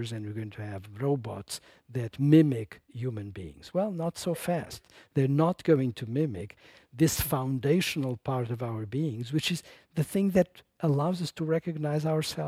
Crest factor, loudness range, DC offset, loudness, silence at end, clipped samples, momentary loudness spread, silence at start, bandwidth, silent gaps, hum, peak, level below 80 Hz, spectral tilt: 22 dB; 2 LU; under 0.1%; -29 LUFS; 0 s; under 0.1%; 13 LU; 0 s; 16.5 kHz; none; none; -8 dBFS; -56 dBFS; -6 dB/octave